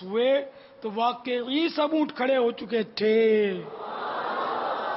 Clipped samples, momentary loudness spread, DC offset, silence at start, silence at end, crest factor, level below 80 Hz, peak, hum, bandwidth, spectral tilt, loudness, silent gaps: under 0.1%; 12 LU; under 0.1%; 0 s; 0 s; 14 dB; -74 dBFS; -12 dBFS; none; 5.8 kHz; -8.5 dB/octave; -26 LUFS; none